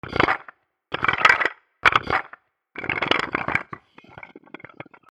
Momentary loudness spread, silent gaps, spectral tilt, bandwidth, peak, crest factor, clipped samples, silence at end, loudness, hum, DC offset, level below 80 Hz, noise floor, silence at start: 26 LU; none; -4 dB/octave; 14 kHz; 0 dBFS; 24 dB; under 0.1%; 0.75 s; -21 LUFS; none; under 0.1%; -52 dBFS; -50 dBFS; 0.05 s